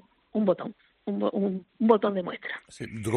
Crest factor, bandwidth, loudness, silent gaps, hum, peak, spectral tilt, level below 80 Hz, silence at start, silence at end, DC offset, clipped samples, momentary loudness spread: 22 dB; 11.5 kHz; -28 LUFS; none; none; -6 dBFS; -7 dB/octave; -66 dBFS; 0.35 s; 0 s; under 0.1%; under 0.1%; 15 LU